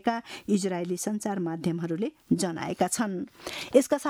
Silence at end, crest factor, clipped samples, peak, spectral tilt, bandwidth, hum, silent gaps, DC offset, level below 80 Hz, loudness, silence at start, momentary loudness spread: 0 s; 22 dB; under 0.1%; -6 dBFS; -5 dB/octave; over 20 kHz; none; none; under 0.1%; -66 dBFS; -29 LUFS; 0.05 s; 9 LU